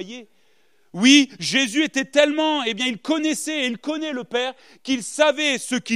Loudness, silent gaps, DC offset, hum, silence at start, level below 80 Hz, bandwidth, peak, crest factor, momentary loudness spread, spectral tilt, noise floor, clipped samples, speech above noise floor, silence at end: -20 LUFS; none; 0.1%; none; 0 s; -76 dBFS; 14.5 kHz; -2 dBFS; 20 dB; 13 LU; -2.5 dB/octave; -64 dBFS; under 0.1%; 43 dB; 0 s